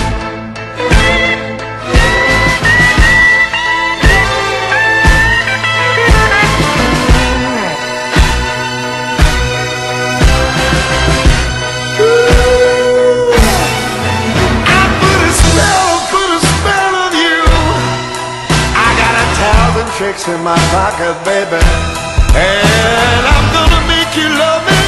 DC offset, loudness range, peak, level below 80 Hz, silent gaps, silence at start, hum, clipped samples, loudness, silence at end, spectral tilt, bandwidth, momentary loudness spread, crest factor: under 0.1%; 4 LU; 0 dBFS; -16 dBFS; none; 0 s; none; 0.2%; -10 LUFS; 0 s; -4 dB/octave; 13 kHz; 7 LU; 10 dB